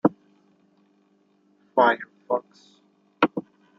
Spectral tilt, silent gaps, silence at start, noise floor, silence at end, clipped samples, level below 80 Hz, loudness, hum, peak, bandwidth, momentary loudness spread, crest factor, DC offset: -7.5 dB/octave; none; 0.05 s; -64 dBFS; 0.4 s; under 0.1%; -74 dBFS; -25 LUFS; none; -4 dBFS; 7.2 kHz; 9 LU; 24 dB; under 0.1%